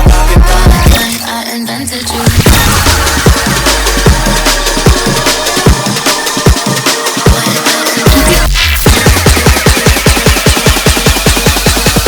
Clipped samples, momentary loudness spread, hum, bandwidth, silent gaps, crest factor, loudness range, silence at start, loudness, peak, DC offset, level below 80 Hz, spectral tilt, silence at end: 2%; 3 LU; none; over 20 kHz; none; 8 dB; 2 LU; 0 s; -8 LUFS; 0 dBFS; under 0.1%; -12 dBFS; -3.5 dB/octave; 0 s